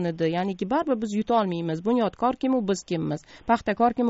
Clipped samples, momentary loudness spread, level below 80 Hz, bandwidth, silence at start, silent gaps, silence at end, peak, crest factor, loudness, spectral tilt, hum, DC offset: under 0.1%; 5 LU; -56 dBFS; 8 kHz; 0 s; none; 0 s; -8 dBFS; 16 dB; -25 LUFS; -5.5 dB/octave; none; under 0.1%